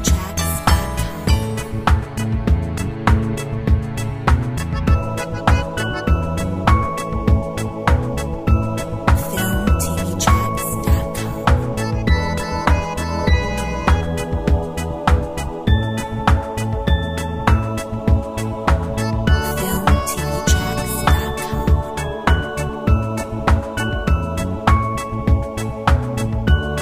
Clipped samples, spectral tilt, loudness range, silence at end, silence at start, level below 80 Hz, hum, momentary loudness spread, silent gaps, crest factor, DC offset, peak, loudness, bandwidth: under 0.1%; -5.5 dB/octave; 1 LU; 0 s; 0 s; -22 dBFS; none; 5 LU; none; 16 dB; 0.2%; -2 dBFS; -19 LUFS; 16 kHz